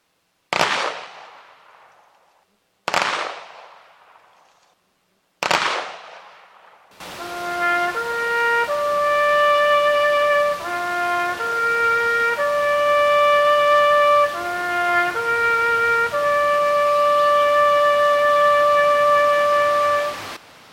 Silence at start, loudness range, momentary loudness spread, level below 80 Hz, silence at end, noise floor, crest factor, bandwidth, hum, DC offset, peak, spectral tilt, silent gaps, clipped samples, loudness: 0.5 s; 12 LU; 12 LU; -60 dBFS; 0.35 s; -67 dBFS; 20 dB; 16.5 kHz; none; under 0.1%; 0 dBFS; -2 dB/octave; none; under 0.1%; -18 LUFS